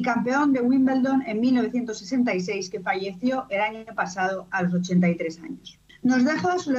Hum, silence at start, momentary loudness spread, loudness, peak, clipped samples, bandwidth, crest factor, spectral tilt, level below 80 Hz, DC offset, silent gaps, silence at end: none; 0 s; 9 LU; -24 LUFS; -10 dBFS; under 0.1%; 7.8 kHz; 12 dB; -6 dB/octave; -64 dBFS; under 0.1%; none; 0 s